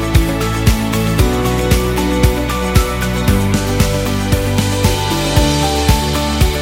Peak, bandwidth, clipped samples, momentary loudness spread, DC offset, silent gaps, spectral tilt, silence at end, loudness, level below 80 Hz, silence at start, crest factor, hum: 0 dBFS; 17 kHz; under 0.1%; 2 LU; under 0.1%; none; -5 dB/octave; 0 s; -15 LUFS; -20 dBFS; 0 s; 14 dB; none